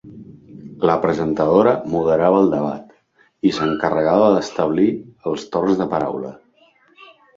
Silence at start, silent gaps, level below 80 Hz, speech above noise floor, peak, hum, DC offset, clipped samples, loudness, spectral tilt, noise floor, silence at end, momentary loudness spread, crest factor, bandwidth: 0.05 s; none; -52 dBFS; 41 dB; 0 dBFS; none; under 0.1%; under 0.1%; -18 LUFS; -7 dB/octave; -58 dBFS; 1 s; 11 LU; 18 dB; 7.6 kHz